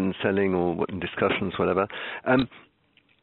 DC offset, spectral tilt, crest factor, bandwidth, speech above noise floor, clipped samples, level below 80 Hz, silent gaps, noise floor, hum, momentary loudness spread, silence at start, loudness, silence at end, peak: under 0.1%; -4.5 dB/octave; 20 dB; 4.2 kHz; 39 dB; under 0.1%; -56 dBFS; none; -64 dBFS; none; 6 LU; 0 s; -26 LUFS; 0.65 s; -6 dBFS